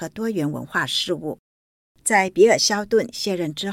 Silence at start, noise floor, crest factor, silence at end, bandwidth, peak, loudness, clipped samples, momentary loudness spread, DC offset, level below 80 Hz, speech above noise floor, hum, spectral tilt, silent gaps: 0 s; under -90 dBFS; 18 dB; 0 s; 16.5 kHz; -4 dBFS; -20 LUFS; under 0.1%; 12 LU; under 0.1%; -60 dBFS; over 69 dB; none; -3 dB/octave; 1.39-1.95 s